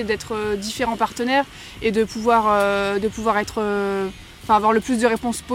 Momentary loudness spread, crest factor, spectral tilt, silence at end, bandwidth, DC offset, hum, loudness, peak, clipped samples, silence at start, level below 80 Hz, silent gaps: 8 LU; 18 dB; -4.5 dB/octave; 0 s; 16.5 kHz; under 0.1%; none; -21 LUFS; -4 dBFS; under 0.1%; 0 s; -46 dBFS; none